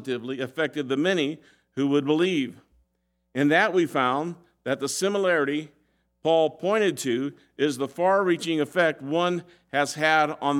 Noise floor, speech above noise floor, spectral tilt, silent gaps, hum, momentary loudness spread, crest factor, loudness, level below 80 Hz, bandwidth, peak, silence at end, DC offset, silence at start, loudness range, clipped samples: -74 dBFS; 50 dB; -4.5 dB/octave; none; none; 10 LU; 18 dB; -25 LUFS; -74 dBFS; 16 kHz; -6 dBFS; 0 s; under 0.1%; 0 s; 1 LU; under 0.1%